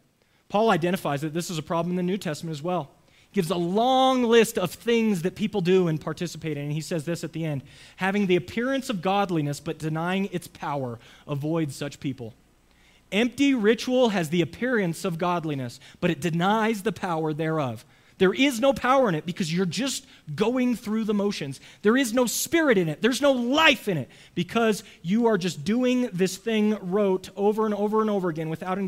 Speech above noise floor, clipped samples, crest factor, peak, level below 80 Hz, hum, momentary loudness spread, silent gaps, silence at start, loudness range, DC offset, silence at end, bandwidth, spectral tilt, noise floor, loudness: 40 dB; under 0.1%; 22 dB; -4 dBFS; -60 dBFS; none; 11 LU; none; 0.5 s; 5 LU; under 0.1%; 0 s; 16 kHz; -5 dB/octave; -64 dBFS; -25 LUFS